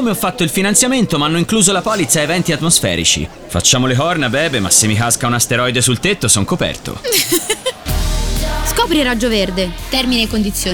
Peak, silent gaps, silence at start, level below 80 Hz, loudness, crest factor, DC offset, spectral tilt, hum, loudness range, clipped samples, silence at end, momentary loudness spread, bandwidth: 0 dBFS; none; 0 s; -28 dBFS; -14 LUFS; 14 dB; under 0.1%; -3 dB/octave; none; 3 LU; under 0.1%; 0 s; 8 LU; over 20 kHz